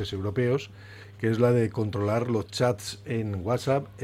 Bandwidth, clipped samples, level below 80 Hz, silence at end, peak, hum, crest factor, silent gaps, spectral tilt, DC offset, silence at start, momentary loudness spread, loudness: 15 kHz; under 0.1%; -56 dBFS; 0 s; -10 dBFS; none; 18 dB; none; -6.5 dB/octave; under 0.1%; 0 s; 10 LU; -27 LUFS